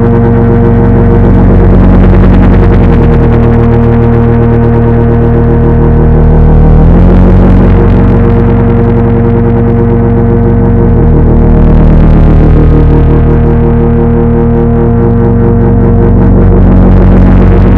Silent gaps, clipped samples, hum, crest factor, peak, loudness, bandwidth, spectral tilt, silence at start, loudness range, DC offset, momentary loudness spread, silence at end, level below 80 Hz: none; 6%; none; 4 dB; 0 dBFS; -5 LUFS; 3.9 kHz; -11.5 dB/octave; 0 s; 1 LU; under 0.1%; 3 LU; 0 s; -8 dBFS